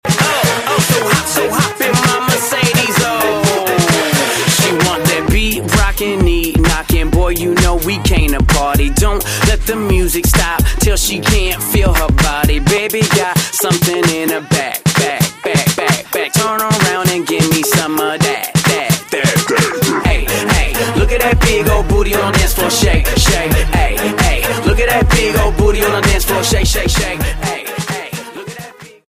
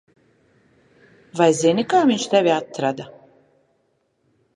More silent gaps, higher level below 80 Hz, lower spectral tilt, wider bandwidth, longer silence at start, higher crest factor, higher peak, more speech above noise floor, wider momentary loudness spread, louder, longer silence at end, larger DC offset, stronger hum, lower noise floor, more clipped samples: neither; first, -18 dBFS vs -68 dBFS; about the same, -4 dB/octave vs -4.5 dB/octave; first, 16 kHz vs 11.5 kHz; second, 0.05 s vs 1.35 s; second, 12 dB vs 18 dB; first, 0 dBFS vs -4 dBFS; second, 20 dB vs 49 dB; second, 3 LU vs 17 LU; first, -13 LUFS vs -19 LUFS; second, 0.2 s vs 1.5 s; neither; neither; second, -33 dBFS vs -67 dBFS; neither